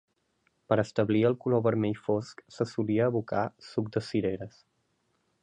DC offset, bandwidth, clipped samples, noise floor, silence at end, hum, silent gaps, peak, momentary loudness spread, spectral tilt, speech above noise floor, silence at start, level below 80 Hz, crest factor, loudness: under 0.1%; 9.8 kHz; under 0.1%; -74 dBFS; 0.95 s; none; none; -10 dBFS; 9 LU; -7.5 dB/octave; 46 dB; 0.7 s; -64 dBFS; 20 dB; -29 LUFS